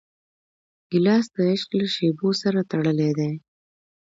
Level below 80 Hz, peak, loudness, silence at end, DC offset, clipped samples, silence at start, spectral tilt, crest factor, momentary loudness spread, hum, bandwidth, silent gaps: -68 dBFS; -8 dBFS; -23 LUFS; 0.8 s; under 0.1%; under 0.1%; 0.9 s; -6.5 dB/octave; 16 dB; 7 LU; none; 7.8 kHz; none